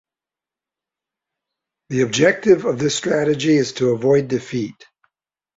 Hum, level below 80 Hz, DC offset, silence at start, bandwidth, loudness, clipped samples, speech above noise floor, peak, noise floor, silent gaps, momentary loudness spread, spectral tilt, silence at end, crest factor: none; -58 dBFS; under 0.1%; 1.9 s; 8 kHz; -18 LUFS; under 0.1%; 72 dB; -2 dBFS; -89 dBFS; none; 10 LU; -5 dB/octave; 0.85 s; 18 dB